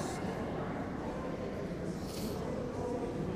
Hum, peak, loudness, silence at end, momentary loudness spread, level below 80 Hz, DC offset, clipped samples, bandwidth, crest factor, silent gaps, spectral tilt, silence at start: none; -26 dBFS; -39 LUFS; 0 s; 2 LU; -52 dBFS; under 0.1%; under 0.1%; 15.5 kHz; 12 dB; none; -6.5 dB/octave; 0 s